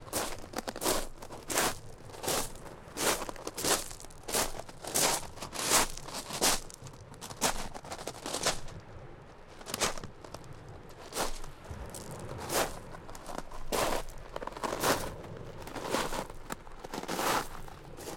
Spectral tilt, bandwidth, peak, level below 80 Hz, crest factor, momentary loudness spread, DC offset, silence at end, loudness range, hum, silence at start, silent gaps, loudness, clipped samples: -2 dB/octave; 17 kHz; -10 dBFS; -46 dBFS; 24 dB; 19 LU; under 0.1%; 0 s; 8 LU; none; 0 s; none; -33 LUFS; under 0.1%